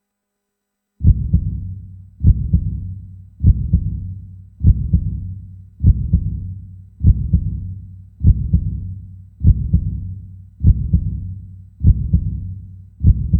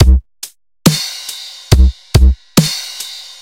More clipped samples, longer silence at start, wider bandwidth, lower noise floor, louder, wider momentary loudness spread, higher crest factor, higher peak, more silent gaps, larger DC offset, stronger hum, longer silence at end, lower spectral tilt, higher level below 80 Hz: second, under 0.1% vs 0.2%; first, 1 s vs 0 s; second, 0.7 kHz vs 17 kHz; first, -77 dBFS vs -29 dBFS; second, -19 LUFS vs -14 LUFS; first, 19 LU vs 15 LU; first, 18 dB vs 12 dB; about the same, 0 dBFS vs 0 dBFS; neither; neither; neither; second, 0 s vs 0.15 s; first, -15.5 dB/octave vs -5 dB/octave; second, -20 dBFS vs -14 dBFS